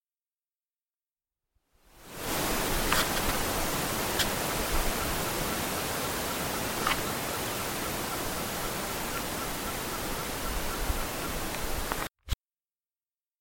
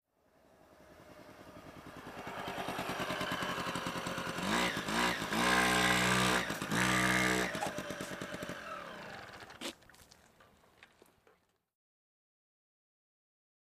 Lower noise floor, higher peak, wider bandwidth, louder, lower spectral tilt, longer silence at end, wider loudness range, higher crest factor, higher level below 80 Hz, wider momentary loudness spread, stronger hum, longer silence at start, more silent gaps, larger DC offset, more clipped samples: first, under -90 dBFS vs -71 dBFS; first, -6 dBFS vs -16 dBFS; about the same, 17 kHz vs 15.5 kHz; about the same, -31 LUFS vs -33 LUFS; about the same, -2.5 dB/octave vs -3 dB/octave; second, 1.05 s vs 2.85 s; second, 5 LU vs 19 LU; about the same, 26 dB vs 22 dB; first, -40 dBFS vs -60 dBFS; second, 5 LU vs 21 LU; neither; first, 1.95 s vs 0.8 s; neither; neither; neither